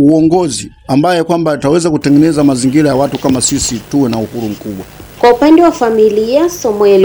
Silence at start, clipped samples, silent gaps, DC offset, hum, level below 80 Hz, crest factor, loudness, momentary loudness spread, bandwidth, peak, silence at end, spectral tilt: 0 s; 0.4%; none; under 0.1%; none; -38 dBFS; 10 dB; -11 LUFS; 12 LU; over 20 kHz; 0 dBFS; 0 s; -5.5 dB/octave